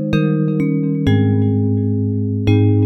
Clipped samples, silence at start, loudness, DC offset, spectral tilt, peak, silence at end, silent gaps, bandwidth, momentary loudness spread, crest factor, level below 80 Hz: under 0.1%; 0 s; -16 LUFS; under 0.1%; -9.5 dB/octave; -2 dBFS; 0 s; none; 6 kHz; 4 LU; 12 dB; -40 dBFS